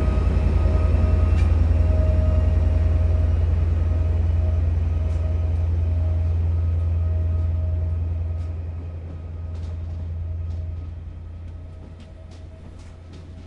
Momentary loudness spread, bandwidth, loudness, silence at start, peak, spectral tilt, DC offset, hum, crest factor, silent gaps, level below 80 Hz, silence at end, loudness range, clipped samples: 21 LU; 4.1 kHz; -23 LUFS; 0 s; -8 dBFS; -9.5 dB/octave; under 0.1%; none; 12 dB; none; -26 dBFS; 0 s; 13 LU; under 0.1%